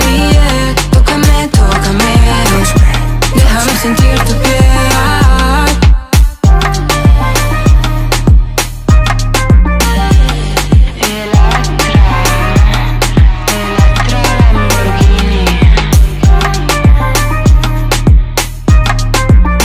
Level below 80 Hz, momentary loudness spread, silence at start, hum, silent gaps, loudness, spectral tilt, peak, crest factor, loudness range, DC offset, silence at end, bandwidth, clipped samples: -10 dBFS; 3 LU; 0 s; none; none; -9 LUFS; -5 dB/octave; 0 dBFS; 8 dB; 1 LU; under 0.1%; 0 s; 16 kHz; 1%